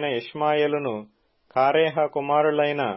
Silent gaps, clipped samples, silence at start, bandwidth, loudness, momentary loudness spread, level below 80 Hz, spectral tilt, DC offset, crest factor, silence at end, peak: none; under 0.1%; 0 s; 5.8 kHz; -23 LUFS; 9 LU; -72 dBFS; -10 dB/octave; under 0.1%; 14 dB; 0 s; -8 dBFS